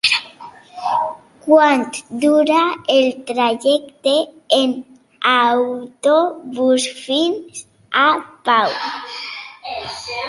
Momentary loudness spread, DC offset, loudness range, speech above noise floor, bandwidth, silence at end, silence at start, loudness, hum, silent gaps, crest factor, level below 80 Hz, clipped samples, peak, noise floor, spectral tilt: 14 LU; under 0.1%; 3 LU; 23 dB; 11.5 kHz; 0 s; 0.05 s; -17 LUFS; none; none; 16 dB; -64 dBFS; under 0.1%; -2 dBFS; -39 dBFS; -2.5 dB/octave